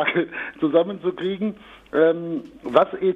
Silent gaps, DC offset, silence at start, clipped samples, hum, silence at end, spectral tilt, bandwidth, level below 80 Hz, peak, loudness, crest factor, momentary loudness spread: none; under 0.1%; 0 s; under 0.1%; none; 0 s; -8 dB/octave; 5.2 kHz; -60 dBFS; -2 dBFS; -22 LUFS; 20 dB; 10 LU